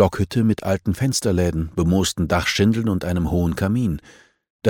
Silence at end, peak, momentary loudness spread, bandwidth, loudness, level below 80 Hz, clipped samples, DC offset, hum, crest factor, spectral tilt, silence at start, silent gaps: 0 s; -2 dBFS; 4 LU; 17.5 kHz; -20 LUFS; -36 dBFS; under 0.1%; 0.2%; none; 18 dB; -5.5 dB/octave; 0 s; 4.50-4.59 s